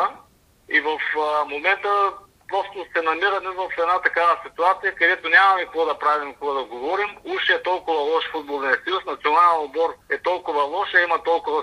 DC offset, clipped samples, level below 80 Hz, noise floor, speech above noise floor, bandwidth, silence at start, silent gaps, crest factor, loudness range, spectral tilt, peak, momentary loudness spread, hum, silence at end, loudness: under 0.1%; under 0.1%; -62 dBFS; -54 dBFS; 33 dB; 11.5 kHz; 0 s; none; 18 dB; 3 LU; -3 dB/octave; -4 dBFS; 9 LU; none; 0 s; -21 LUFS